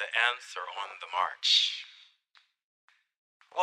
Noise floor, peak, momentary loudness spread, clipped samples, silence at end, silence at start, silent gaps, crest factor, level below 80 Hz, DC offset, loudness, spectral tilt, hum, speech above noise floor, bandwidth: -67 dBFS; -10 dBFS; 16 LU; under 0.1%; 0 s; 0 s; 2.64-2.88 s, 3.16-3.40 s; 22 dB; under -90 dBFS; under 0.1%; -28 LUFS; 3 dB/octave; none; 37 dB; 13 kHz